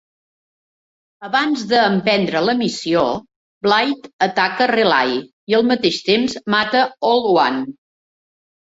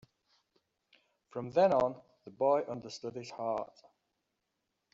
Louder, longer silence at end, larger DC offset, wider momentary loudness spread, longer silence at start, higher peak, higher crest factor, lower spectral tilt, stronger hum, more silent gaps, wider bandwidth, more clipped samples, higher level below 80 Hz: first, -17 LUFS vs -33 LUFS; second, 0.9 s vs 1.25 s; neither; second, 7 LU vs 17 LU; second, 1.2 s vs 1.35 s; first, -2 dBFS vs -16 dBFS; about the same, 16 dB vs 20 dB; about the same, -4.5 dB/octave vs -5 dB/octave; neither; first, 3.36-3.61 s, 4.13-4.19 s, 5.33-5.47 s vs none; about the same, 8 kHz vs 7.8 kHz; neither; first, -60 dBFS vs -74 dBFS